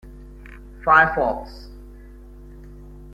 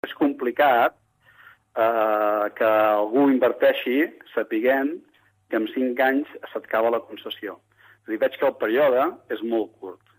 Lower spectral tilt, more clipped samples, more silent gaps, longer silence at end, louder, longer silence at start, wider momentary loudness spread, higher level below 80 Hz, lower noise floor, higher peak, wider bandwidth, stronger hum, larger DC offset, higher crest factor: about the same, -6.5 dB/octave vs -7 dB/octave; neither; neither; second, 0 s vs 0.25 s; first, -18 LUFS vs -22 LUFS; about the same, 0.05 s vs 0.05 s; first, 28 LU vs 14 LU; first, -40 dBFS vs -74 dBFS; second, -42 dBFS vs -53 dBFS; first, -2 dBFS vs -8 dBFS; second, 14 kHz vs 15.5 kHz; first, 50 Hz at -40 dBFS vs none; neither; first, 22 dB vs 14 dB